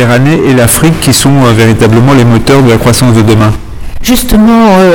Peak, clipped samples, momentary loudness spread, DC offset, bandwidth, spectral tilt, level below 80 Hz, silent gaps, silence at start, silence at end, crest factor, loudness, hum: 0 dBFS; 5%; 6 LU; 4%; 19.5 kHz; -5.5 dB/octave; -20 dBFS; none; 0 s; 0 s; 4 dB; -5 LUFS; none